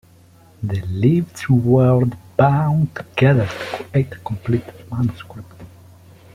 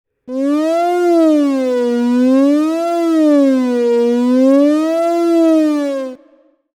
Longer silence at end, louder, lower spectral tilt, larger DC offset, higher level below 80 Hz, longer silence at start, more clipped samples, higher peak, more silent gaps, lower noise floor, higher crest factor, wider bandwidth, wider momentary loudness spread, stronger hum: about the same, 0.7 s vs 0.6 s; second, -18 LUFS vs -13 LUFS; first, -8.5 dB/octave vs -5 dB/octave; neither; first, -48 dBFS vs -72 dBFS; first, 0.6 s vs 0.3 s; neither; about the same, -2 dBFS vs -2 dBFS; neither; about the same, -48 dBFS vs -51 dBFS; first, 16 dB vs 10 dB; second, 11 kHz vs 13.5 kHz; first, 13 LU vs 6 LU; neither